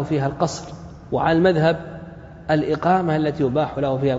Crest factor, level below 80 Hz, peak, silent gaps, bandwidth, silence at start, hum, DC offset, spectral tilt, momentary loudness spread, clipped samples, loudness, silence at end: 16 dB; -46 dBFS; -4 dBFS; none; 7.8 kHz; 0 s; none; under 0.1%; -7 dB/octave; 19 LU; under 0.1%; -20 LUFS; 0 s